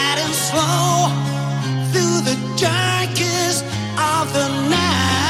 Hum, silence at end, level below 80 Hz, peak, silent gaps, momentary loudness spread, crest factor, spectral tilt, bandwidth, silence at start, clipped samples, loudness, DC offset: none; 0 s; -50 dBFS; -4 dBFS; none; 5 LU; 14 dB; -4 dB/octave; 16 kHz; 0 s; under 0.1%; -18 LUFS; under 0.1%